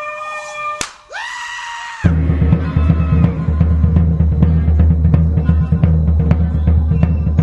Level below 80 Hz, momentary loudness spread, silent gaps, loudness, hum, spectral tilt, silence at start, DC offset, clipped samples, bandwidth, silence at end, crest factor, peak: -18 dBFS; 11 LU; none; -15 LUFS; none; -7.5 dB/octave; 0 s; under 0.1%; under 0.1%; 9 kHz; 0 s; 14 dB; 0 dBFS